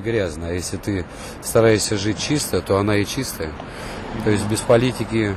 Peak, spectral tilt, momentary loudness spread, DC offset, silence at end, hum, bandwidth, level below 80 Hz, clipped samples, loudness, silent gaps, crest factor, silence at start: -4 dBFS; -5 dB/octave; 13 LU; under 0.1%; 0 s; none; 14 kHz; -40 dBFS; under 0.1%; -21 LUFS; none; 16 dB; 0 s